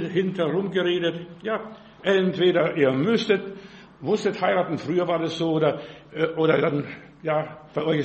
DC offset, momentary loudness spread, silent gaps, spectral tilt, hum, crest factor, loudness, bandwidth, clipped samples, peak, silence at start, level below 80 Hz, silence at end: under 0.1%; 13 LU; none; -6.5 dB/octave; none; 18 dB; -24 LUFS; 8.4 kHz; under 0.1%; -6 dBFS; 0 s; -64 dBFS; 0 s